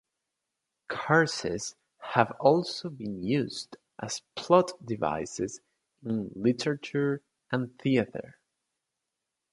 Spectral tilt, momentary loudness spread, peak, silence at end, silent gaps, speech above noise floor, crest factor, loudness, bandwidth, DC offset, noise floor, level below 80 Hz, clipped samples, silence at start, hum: -5 dB/octave; 15 LU; -6 dBFS; 1.2 s; none; 57 dB; 24 dB; -29 LUFS; 11.5 kHz; under 0.1%; -85 dBFS; -64 dBFS; under 0.1%; 0.9 s; none